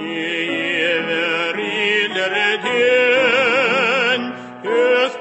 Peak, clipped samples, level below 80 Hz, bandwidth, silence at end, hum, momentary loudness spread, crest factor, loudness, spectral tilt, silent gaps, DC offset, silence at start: -4 dBFS; under 0.1%; -66 dBFS; 8.4 kHz; 0 s; none; 7 LU; 14 dB; -16 LUFS; -3.5 dB/octave; none; under 0.1%; 0 s